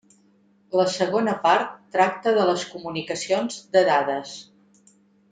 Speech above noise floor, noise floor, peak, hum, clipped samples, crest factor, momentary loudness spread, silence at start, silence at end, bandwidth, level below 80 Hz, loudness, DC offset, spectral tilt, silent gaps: 38 dB; -60 dBFS; -4 dBFS; none; under 0.1%; 18 dB; 11 LU; 0.7 s; 0.9 s; 9.4 kHz; -70 dBFS; -23 LUFS; under 0.1%; -4 dB/octave; none